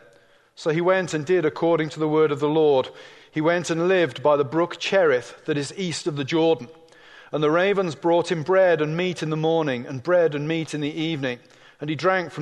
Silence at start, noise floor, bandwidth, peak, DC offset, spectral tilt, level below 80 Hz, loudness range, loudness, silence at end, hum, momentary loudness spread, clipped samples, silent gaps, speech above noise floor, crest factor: 0.6 s; -56 dBFS; 11 kHz; -6 dBFS; under 0.1%; -5.5 dB/octave; -68 dBFS; 2 LU; -22 LUFS; 0 s; none; 9 LU; under 0.1%; none; 34 dB; 16 dB